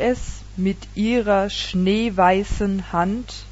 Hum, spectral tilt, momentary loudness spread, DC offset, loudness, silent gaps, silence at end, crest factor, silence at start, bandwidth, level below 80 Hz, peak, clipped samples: none; -6 dB/octave; 8 LU; under 0.1%; -21 LUFS; none; 0 s; 16 dB; 0 s; 8 kHz; -36 dBFS; -4 dBFS; under 0.1%